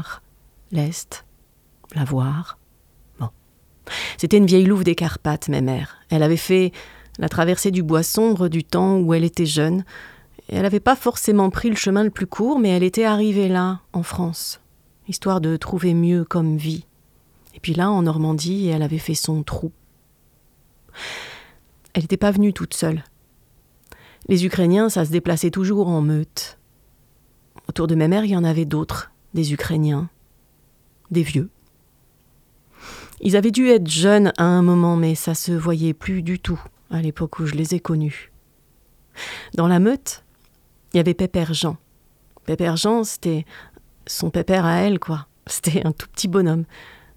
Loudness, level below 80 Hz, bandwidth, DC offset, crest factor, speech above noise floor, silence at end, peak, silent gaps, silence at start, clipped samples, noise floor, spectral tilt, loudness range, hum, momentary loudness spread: -20 LUFS; -48 dBFS; 16 kHz; under 0.1%; 20 dB; 38 dB; 0.25 s; 0 dBFS; none; 0 s; under 0.1%; -57 dBFS; -6 dB/octave; 7 LU; none; 16 LU